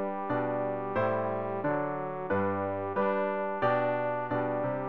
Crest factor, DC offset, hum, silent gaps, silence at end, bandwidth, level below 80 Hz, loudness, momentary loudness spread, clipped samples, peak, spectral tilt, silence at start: 16 dB; 0.3%; none; none; 0 s; 5.2 kHz; -66 dBFS; -31 LUFS; 4 LU; under 0.1%; -16 dBFS; -9.5 dB/octave; 0 s